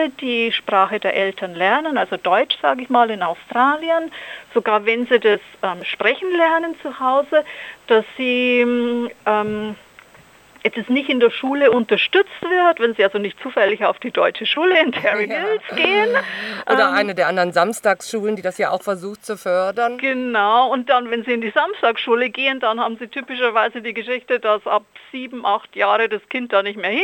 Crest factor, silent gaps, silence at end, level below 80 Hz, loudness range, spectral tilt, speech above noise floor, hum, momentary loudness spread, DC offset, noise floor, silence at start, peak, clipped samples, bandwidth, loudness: 18 dB; none; 0 s; -68 dBFS; 3 LU; -4 dB/octave; 29 dB; none; 9 LU; under 0.1%; -48 dBFS; 0 s; -2 dBFS; under 0.1%; 17 kHz; -18 LUFS